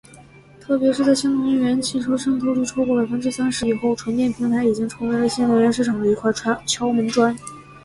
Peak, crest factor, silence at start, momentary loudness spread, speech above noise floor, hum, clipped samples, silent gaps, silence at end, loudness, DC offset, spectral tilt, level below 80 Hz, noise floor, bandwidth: -6 dBFS; 14 dB; 0.1 s; 5 LU; 26 dB; none; under 0.1%; none; 0.05 s; -20 LUFS; under 0.1%; -4.5 dB/octave; -52 dBFS; -46 dBFS; 11.5 kHz